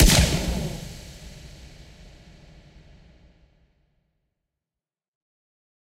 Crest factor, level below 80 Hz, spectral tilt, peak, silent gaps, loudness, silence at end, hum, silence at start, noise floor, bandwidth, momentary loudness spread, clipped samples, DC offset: 28 dB; -32 dBFS; -3.5 dB/octave; 0 dBFS; none; -23 LUFS; 4.35 s; none; 0 s; under -90 dBFS; 16 kHz; 29 LU; under 0.1%; under 0.1%